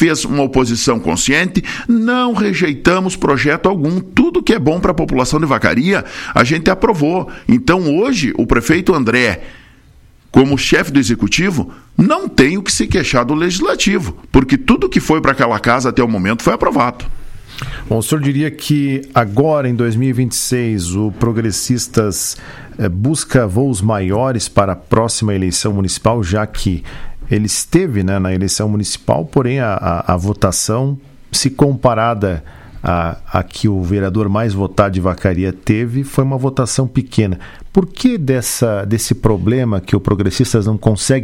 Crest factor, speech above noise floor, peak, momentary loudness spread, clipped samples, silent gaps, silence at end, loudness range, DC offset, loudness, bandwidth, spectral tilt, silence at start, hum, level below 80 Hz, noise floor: 14 dB; 31 dB; 0 dBFS; 6 LU; under 0.1%; none; 0 s; 3 LU; under 0.1%; -14 LUFS; 16.5 kHz; -5 dB/octave; 0 s; none; -32 dBFS; -44 dBFS